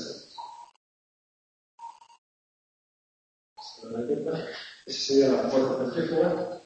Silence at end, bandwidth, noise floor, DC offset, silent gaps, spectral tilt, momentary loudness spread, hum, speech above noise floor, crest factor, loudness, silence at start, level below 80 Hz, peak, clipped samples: 0.05 s; 8.6 kHz; under -90 dBFS; under 0.1%; 0.76-1.78 s, 2.18-3.56 s; -5 dB/octave; 23 LU; none; over 64 dB; 20 dB; -27 LUFS; 0 s; -70 dBFS; -10 dBFS; under 0.1%